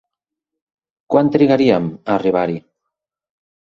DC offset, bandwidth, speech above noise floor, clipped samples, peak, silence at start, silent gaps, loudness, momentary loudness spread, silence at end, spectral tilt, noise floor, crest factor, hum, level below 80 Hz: under 0.1%; 7 kHz; 68 dB; under 0.1%; -2 dBFS; 1.1 s; none; -16 LUFS; 8 LU; 1.2 s; -8.5 dB/octave; -82 dBFS; 18 dB; none; -56 dBFS